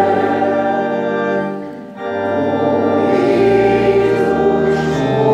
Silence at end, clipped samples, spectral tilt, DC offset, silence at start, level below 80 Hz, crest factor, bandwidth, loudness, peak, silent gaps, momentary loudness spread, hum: 0 s; under 0.1%; -7.5 dB/octave; under 0.1%; 0 s; -44 dBFS; 12 dB; 9.2 kHz; -15 LUFS; -2 dBFS; none; 9 LU; none